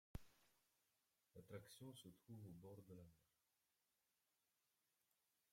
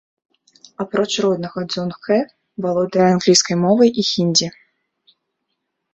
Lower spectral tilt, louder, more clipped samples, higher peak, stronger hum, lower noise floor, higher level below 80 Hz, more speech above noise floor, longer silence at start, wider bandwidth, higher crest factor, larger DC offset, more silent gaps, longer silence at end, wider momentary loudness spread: first, -5.5 dB/octave vs -4 dB/octave; second, -62 LUFS vs -17 LUFS; neither; second, -40 dBFS vs -2 dBFS; neither; first, -90 dBFS vs -75 dBFS; second, -76 dBFS vs -60 dBFS; second, 28 dB vs 58 dB; second, 0.15 s vs 0.8 s; first, 16 kHz vs 8.4 kHz; first, 24 dB vs 18 dB; neither; neither; first, 2.3 s vs 1.45 s; second, 5 LU vs 11 LU